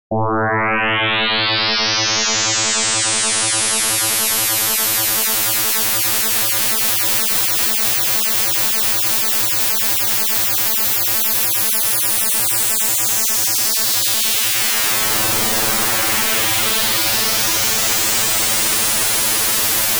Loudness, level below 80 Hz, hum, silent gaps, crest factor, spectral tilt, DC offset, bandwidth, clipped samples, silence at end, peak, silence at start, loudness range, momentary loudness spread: -14 LUFS; -50 dBFS; none; none; 14 dB; -0.5 dB/octave; under 0.1%; over 20 kHz; under 0.1%; 0 s; -4 dBFS; 0.1 s; 1 LU; 1 LU